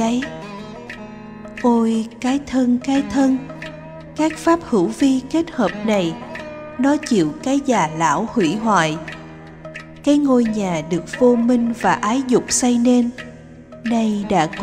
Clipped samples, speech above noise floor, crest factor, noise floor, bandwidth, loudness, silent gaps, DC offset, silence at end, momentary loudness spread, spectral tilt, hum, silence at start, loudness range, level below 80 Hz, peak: under 0.1%; 21 dB; 16 dB; -39 dBFS; 13.5 kHz; -18 LUFS; none; under 0.1%; 0 s; 17 LU; -5 dB/octave; none; 0 s; 3 LU; -48 dBFS; -2 dBFS